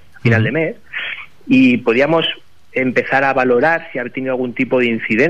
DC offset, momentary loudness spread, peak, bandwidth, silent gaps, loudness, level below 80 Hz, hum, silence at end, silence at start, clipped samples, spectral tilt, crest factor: 1%; 11 LU; -2 dBFS; 7.6 kHz; none; -16 LUFS; -54 dBFS; none; 0 s; 0.25 s; under 0.1%; -7 dB/octave; 14 dB